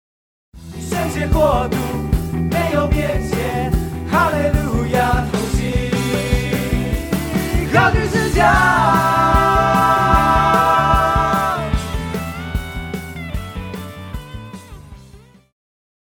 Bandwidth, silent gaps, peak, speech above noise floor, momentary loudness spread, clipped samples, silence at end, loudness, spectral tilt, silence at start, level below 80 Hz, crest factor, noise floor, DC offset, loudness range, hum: over 20 kHz; none; 0 dBFS; 27 dB; 14 LU; under 0.1%; 0.9 s; -17 LUFS; -6 dB/octave; 0.55 s; -26 dBFS; 18 dB; -44 dBFS; under 0.1%; 13 LU; none